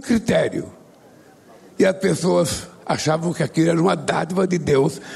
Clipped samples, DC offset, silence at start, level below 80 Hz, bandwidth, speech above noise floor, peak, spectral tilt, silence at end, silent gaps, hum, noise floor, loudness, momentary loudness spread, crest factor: under 0.1%; under 0.1%; 0 s; -50 dBFS; 13.5 kHz; 29 dB; -6 dBFS; -5.5 dB/octave; 0 s; none; none; -48 dBFS; -20 LUFS; 7 LU; 14 dB